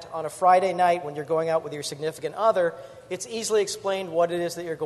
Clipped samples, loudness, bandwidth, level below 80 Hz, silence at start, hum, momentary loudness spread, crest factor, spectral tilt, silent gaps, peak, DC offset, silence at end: under 0.1%; -25 LUFS; 12.5 kHz; -68 dBFS; 0 s; none; 13 LU; 18 dB; -4 dB/octave; none; -6 dBFS; under 0.1%; 0 s